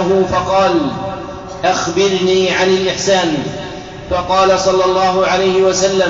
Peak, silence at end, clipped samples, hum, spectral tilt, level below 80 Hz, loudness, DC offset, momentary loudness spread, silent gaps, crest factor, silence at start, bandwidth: -2 dBFS; 0 s; under 0.1%; none; -3 dB/octave; -40 dBFS; -14 LUFS; under 0.1%; 12 LU; none; 10 dB; 0 s; 7.8 kHz